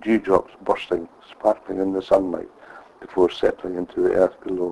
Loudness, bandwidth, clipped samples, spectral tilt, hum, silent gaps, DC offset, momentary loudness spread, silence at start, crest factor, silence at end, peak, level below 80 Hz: -22 LUFS; 11 kHz; under 0.1%; -6.5 dB/octave; none; none; under 0.1%; 10 LU; 0 s; 20 dB; 0 s; -2 dBFS; -54 dBFS